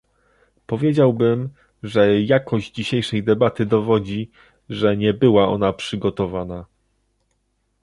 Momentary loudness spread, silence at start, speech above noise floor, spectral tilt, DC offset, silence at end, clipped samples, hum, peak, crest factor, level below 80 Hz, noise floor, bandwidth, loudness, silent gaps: 13 LU; 0.7 s; 50 dB; -7.5 dB/octave; under 0.1%; 1.2 s; under 0.1%; none; -2 dBFS; 18 dB; -50 dBFS; -69 dBFS; 11.5 kHz; -19 LUFS; none